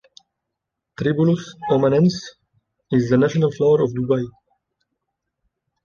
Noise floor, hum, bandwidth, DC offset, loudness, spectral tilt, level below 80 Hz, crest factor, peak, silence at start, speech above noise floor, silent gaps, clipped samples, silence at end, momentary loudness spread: -81 dBFS; none; 7.2 kHz; under 0.1%; -19 LUFS; -7.5 dB/octave; -56 dBFS; 16 dB; -4 dBFS; 1 s; 63 dB; none; under 0.1%; 1.55 s; 8 LU